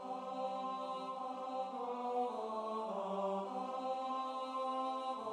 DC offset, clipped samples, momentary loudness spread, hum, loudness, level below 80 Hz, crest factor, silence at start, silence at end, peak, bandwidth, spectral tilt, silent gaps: under 0.1%; under 0.1%; 4 LU; none; -41 LUFS; -90 dBFS; 14 dB; 0 s; 0 s; -28 dBFS; 10.5 kHz; -5.5 dB/octave; none